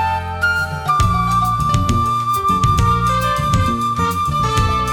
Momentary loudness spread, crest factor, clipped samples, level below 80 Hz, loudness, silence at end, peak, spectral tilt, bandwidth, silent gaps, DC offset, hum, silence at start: 3 LU; 14 dB; under 0.1%; -26 dBFS; -16 LUFS; 0 s; -2 dBFS; -5 dB/octave; 19 kHz; none; under 0.1%; none; 0 s